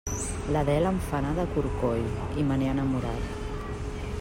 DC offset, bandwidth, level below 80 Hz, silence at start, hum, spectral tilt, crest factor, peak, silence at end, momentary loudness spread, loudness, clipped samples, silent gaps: under 0.1%; 16 kHz; -38 dBFS; 0.05 s; none; -6.5 dB/octave; 14 dB; -14 dBFS; 0 s; 9 LU; -29 LUFS; under 0.1%; none